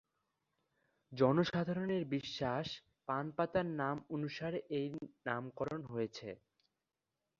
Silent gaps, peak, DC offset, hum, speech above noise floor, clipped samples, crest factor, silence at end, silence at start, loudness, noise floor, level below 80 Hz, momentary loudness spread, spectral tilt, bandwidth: none; -18 dBFS; under 0.1%; none; 52 dB; under 0.1%; 22 dB; 1.05 s; 1.1 s; -38 LUFS; -90 dBFS; -70 dBFS; 11 LU; -5 dB/octave; 7.4 kHz